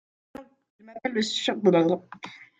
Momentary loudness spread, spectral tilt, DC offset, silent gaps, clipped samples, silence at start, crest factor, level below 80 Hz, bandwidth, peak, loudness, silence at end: 25 LU; -5 dB/octave; under 0.1%; 0.70-0.79 s; under 0.1%; 0.4 s; 20 dB; -72 dBFS; 9.2 kHz; -6 dBFS; -25 LUFS; 0.15 s